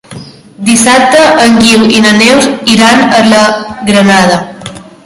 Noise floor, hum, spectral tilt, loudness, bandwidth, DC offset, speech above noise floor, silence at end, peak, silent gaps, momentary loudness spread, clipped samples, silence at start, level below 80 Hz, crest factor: -27 dBFS; none; -3.5 dB/octave; -5 LUFS; 16 kHz; under 0.1%; 22 dB; 0.25 s; 0 dBFS; none; 10 LU; 4%; 0.1 s; -40 dBFS; 6 dB